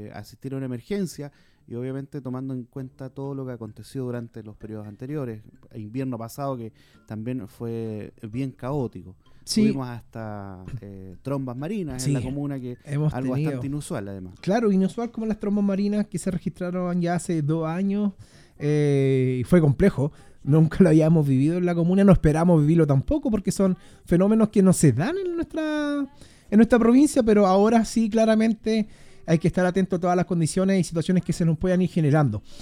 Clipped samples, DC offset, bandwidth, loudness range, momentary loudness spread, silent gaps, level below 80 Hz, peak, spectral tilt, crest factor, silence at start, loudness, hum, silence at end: under 0.1%; under 0.1%; 15 kHz; 14 LU; 18 LU; none; -44 dBFS; -2 dBFS; -7 dB/octave; 20 dB; 0 s; -23 LUFS; none; 0 s